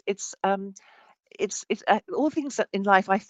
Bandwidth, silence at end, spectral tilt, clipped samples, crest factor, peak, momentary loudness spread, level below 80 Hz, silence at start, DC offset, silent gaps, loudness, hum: 9.2 kHz; 0.05 s; -4 dB/octave; under 0.1%; 22 dB; -4 dBFS; 10 LU; -74 dBFS; 0.05 s; under 0.1%; none; -26 LUFS; none